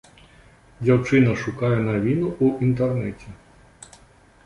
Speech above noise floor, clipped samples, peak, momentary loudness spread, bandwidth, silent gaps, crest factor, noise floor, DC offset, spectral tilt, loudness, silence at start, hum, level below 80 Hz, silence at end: 32 dB; under 0.1%; -6 dBFS; 9 LU; 11 kHz; none; 18 dB; -52 dBFS; under 0.1%; -8 dB/octave; -21 LUFS; 0.8 s; none; -48 dBFS; 1.1 s